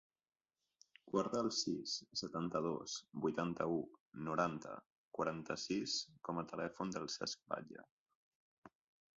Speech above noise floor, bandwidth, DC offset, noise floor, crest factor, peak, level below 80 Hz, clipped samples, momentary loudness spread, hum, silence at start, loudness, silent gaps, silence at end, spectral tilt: over 48 dB; 7.6 kHz; under 0.1%; under -90 dBFS; 22 dB; -22 dBFS; -76 dBFS; under 0.1%; 10 LU; none; 1.05 s; -42 LUFS; 4.00-4.12 s, 4.86-4.90 s, 4.96-5.11 s, 7.91-8.06 s, 8.15-8.62 s; 0.5 s; -4 dB/octave